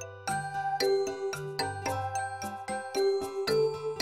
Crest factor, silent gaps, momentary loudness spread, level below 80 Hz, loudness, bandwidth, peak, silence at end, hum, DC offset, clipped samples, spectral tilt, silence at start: 14 dB; none; 7 LU; -64 dBFS; -31 LUFS; 16 kHz; -16 dBFS; 0 s; none; under 0.1%; under 0.1%; -4 dB/octave; 0 s